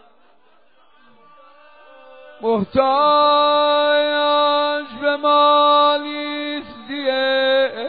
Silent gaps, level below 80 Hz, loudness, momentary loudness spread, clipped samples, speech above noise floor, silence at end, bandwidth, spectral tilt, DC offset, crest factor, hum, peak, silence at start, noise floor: none; -60 dBFS; -16 LUFS; 12 LU; under 0.1%; 42 dB; 0 s; 5 kHz; -0.5 dB/octave; 0.3%; 16 dB; none; -4 dBFS; 2.4 s; -57 dBFS